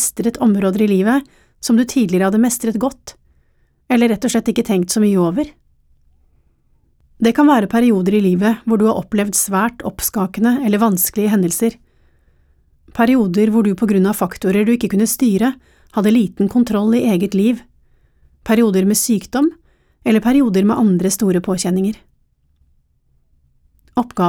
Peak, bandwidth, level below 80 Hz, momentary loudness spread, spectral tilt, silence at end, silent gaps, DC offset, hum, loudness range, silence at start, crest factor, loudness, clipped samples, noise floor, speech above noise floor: -2 dBFS; 18 kHz; -48 dBFS; 7 LU; -5.5 dB/octave; 0 s; none; under 0.1%; none; 3 LU; 0 s; 14 dB; -16 LUFS; under 0.1%; -59 dBFS; 44 dB